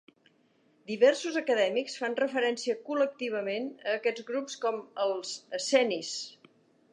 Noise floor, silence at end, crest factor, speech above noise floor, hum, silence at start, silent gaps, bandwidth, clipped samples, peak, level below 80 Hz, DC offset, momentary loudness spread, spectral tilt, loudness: -67 dBFS; 0.6 s; 20 dB; 38 dB; none; 0.9 s; none; 10.5 kHz; under 0.1%; -10 dBFS; -88 dBFS; under 0.1%; 10 LU; -2.5 dB/octave; -30 LUFS